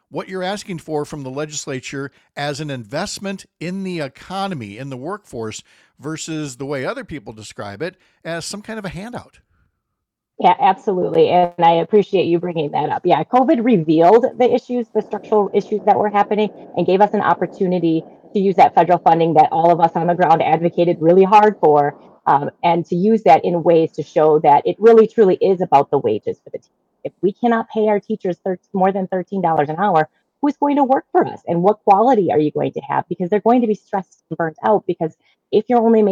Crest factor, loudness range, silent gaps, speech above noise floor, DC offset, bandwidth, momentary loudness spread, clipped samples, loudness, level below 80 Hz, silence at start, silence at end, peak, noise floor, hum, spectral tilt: 16 dB; 13 LU; none; 62 dB; under 0.1%; 12 kHz; 16 LU; under 0.1%; -17 LUFS; -60 dBFS; 0.15 s; 0 s; -2 dBFS; -78 dBFS; none; -6.5 dB/octave